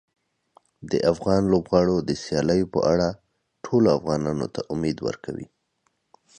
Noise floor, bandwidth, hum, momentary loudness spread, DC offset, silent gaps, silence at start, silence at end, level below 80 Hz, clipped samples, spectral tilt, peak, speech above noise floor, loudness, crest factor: -72 dBFS; 10 kHz; none; 11 LU; under 0.1%; none; 0.8 s; 0.95 s; -48 dBFS; under 0.1%; -6.5 dB/octave; -6 dBFS; 49 dB; -23 LUFS; 20 dB